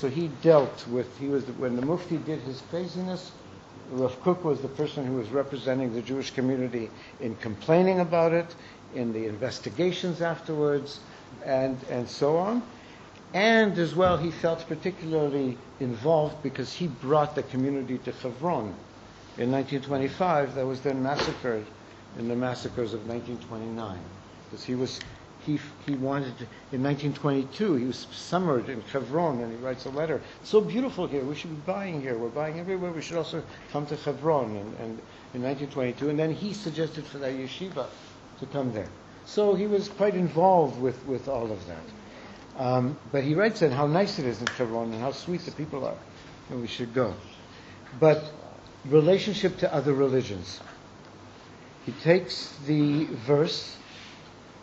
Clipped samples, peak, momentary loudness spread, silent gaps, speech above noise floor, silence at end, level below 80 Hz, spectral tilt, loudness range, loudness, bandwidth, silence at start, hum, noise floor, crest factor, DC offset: under 0.1%; -6 dBFS; 19 LU; none; 21 dB; 0 s; -60 dBFS; -5.5 dB/octave; 6 LU; -28 LUFS; 8 kHz; 0 s; none; -48 dBFS; 22 dB; under 0.1%